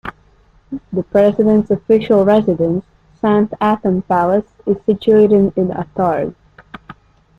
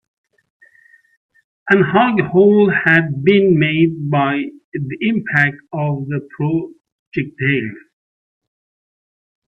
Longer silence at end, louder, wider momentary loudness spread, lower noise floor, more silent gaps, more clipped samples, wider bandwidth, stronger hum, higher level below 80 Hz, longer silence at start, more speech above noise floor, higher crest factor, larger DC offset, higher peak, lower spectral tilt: second, 0.45 s vs 1.75 s; about the same, -15 LUFS vs -16 LUFS; second, 11 LU vs 14 LU; about the same, -50 dBFS vs -51 dBFS; second, none vs 4.64-4.72 s, 6.92-7.12 s; neither; second, 5 kHz vs 5.6 kHz; neither; first, -48 dBFS vs -58 dBFS; second, 0.05 s vs 1.65 s; about the same, 37 dB vs 36 dB; about the same, 14 dB vs 18 dB; neither; about the same, -2 dBFS vs 0 dBFS; about the same, -9 dB/octave vs -9 dB/octave